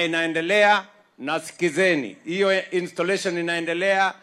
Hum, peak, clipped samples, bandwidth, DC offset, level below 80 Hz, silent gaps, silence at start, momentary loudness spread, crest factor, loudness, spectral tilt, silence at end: none; -6 dBFS; under 0.1%; 14.5 kHz; under 0.1%; -78 dBFS; none; 0 s; 10 LU; 18 dB; -22 LUFS; -4 dB/octave; 0.05 s